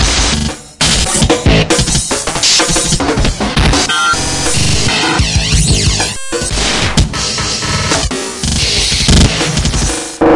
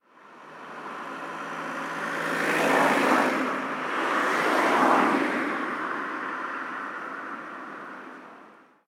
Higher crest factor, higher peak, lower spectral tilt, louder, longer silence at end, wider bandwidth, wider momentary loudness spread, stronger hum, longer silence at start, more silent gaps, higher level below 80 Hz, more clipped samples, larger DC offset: second, 12 dB vs 20 dB; first, 0 dBFS vs -8 dBFS; about the same, -3 dB/octave vs -4 dB/octave; first, -11 LUFS vs -26 LUFS; second, 0 s vs 0.35 s; second, 11.5 kHz vs 17.5 kHz; second, 6 LU vs 18 LU; neither; second, 0 s vs 0.25 s; neither; first, -20 dBFS vs -74 dBFS; neither; neither